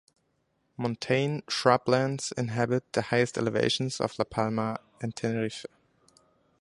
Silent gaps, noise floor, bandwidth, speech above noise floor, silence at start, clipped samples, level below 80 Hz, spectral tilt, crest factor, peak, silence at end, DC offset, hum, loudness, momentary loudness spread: none; -74 dBFS; 11.5 kHz; 46 dB; 0.8 s; under 0.1%; -64 dBFS; -5 dB/octave; 24 dB; -6 dBFS; 0.95 s; under 0.1%; none; -28 LUFS; 10 LU